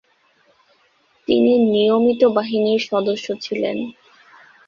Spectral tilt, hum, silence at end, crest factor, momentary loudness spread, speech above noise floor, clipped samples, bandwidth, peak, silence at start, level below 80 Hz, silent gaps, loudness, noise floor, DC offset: -6 dB/octave; none; 0.75 s; 16 dB; 11 LU; 42 dB; under 0.1%; 7.2 kHz; -4 dBFS; 1.3 s; -62 dBFS; none; -18 LUFS; -59 dBFS; under 0.1%